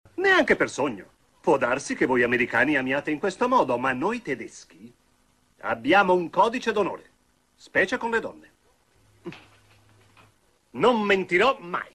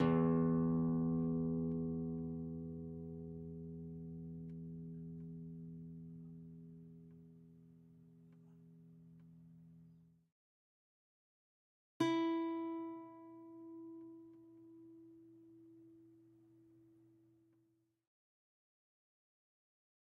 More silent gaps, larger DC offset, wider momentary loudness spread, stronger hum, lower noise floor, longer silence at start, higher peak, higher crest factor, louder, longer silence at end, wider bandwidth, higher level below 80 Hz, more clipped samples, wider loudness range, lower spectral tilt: second, none vs 10.32-12.00 s; neither; second, 18 LU vs 27 LU; neither; second, -65 dBFS vs -79 dBFS; first, 0.2 s vs 0 s; first, -8 dBFS vs -22 dBFS; about the same, 18 dB vs 22 dB; first, -23 LUFS vs -41 LUFS; second, 0.1 s vs 3.85 s; first, 14 kHz vs 4.6 kHz; first, -60 dBFS vs -70 dBFS; neither; second, 7 LU vs 23 LU; second, -4.5 dB/octave vs -8 dB/octave